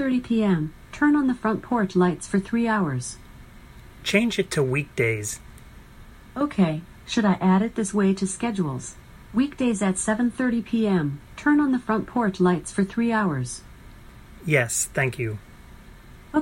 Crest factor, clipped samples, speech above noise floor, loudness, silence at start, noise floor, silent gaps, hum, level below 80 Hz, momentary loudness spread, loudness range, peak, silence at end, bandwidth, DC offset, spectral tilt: 18 dB; under 0.1%; 23 dB; -24 LUFS; 0 s; -46 dBFS; none; none; -48 dBFS; 10 LU; 3 LU; -6 dBFS; 0 s; 16 kHz; under 0.1%; -5.5 dB/octave